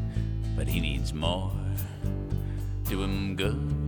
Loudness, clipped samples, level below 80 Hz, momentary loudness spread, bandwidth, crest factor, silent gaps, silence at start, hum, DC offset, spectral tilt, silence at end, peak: -31 LUFS; under 0.1%; -34 dBFS; 4 LU; 18 kHz; 16 dB; none; 0 s; none; under 0.1%; -6 dB/octave; 0 s; -14 dBFS